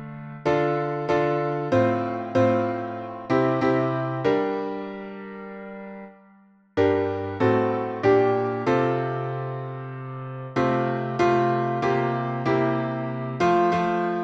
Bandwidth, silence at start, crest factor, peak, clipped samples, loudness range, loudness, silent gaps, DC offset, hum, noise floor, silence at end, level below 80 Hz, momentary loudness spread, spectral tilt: 8 kHz; 0 s; 16 dB; -8 dBFS; under 0.1%; 4 LU; -24 LUFS; none; under 0.1%; none; -55 dBFS; 0 s; -60 dBFS; 14 LU; -8 dB/octave